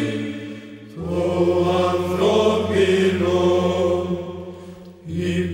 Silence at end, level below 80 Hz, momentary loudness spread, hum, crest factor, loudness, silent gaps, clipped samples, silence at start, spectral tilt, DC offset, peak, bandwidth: 0 s; -50 dBFS; 19 LU; none; 16 dB; -20 LUFS; none; under 0.1%; 0 s; -6.5 dB/octave; under 0.1%; -6 dBFS; 15 kHz